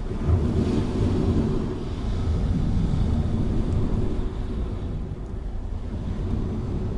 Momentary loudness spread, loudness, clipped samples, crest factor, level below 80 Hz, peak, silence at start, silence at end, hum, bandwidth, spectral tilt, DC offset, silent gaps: 10 LU; -27 LUFS; under 0.1%; 14 dB; -28 dBFS; -10 dBFS; 0 s; 0 s; none; 10.5 kHz; -8.5 dB/octave; under 0.1%; none